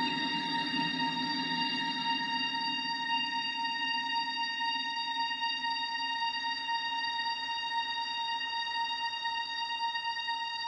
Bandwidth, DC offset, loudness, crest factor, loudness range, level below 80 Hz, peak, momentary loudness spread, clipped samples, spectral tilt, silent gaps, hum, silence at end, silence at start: 11 kHz; under 0.1%; -32 LUFS; 14 dB; 2 LU; -74 dBFS; -20 dBFS; 2 LU; under 0.1%; -2.5 dB/octave; none; none; 0 s; 0 s